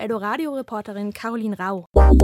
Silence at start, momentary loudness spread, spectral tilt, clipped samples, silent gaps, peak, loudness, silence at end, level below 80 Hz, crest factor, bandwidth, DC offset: 0 s; 13 LU; -8 dB/octave; under 0.1%; 1.86-1.92 s; -2 dBFS; -23 LUFS; 0 s; -20 dBFS; 16 dB; 12 kHz; under 0.1%